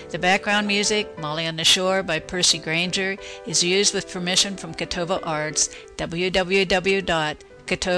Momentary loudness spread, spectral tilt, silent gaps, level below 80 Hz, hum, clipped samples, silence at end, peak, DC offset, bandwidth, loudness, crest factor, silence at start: 10 LU; -2 dB/octave; none; -48 dBFS; none; under 0.1%; 0 s; -8 dBFS; under 0.1%; 11 kHz; -21 LUFS; 14 dB; 0 s